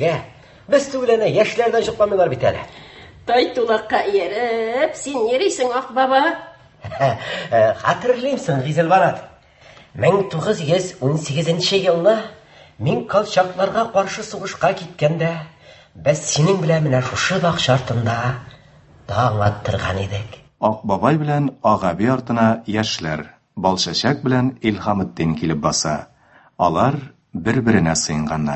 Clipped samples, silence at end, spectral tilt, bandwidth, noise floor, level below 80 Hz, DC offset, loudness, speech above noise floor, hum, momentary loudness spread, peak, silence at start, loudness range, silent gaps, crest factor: under 0.1%; 0 s; -5 dB/octave; 8.6 kHz; -47 dBFS; -46 dBFS; under 0.1%; -19 LUFS; 29 dB; none; 9 LU; -2 dBFS; 0 s; 2 LU; none; 18 dB